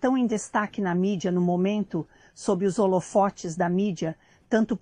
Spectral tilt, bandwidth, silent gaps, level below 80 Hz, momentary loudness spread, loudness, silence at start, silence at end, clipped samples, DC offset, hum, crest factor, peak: -6.5 dB/octave; 10.5 kHz; none; -60 dBFS; 9 LU; -26 LUFS; 0 s; 0.05 s; under 0.1%; under 0.1%; none; 16 dB; -10 dBFS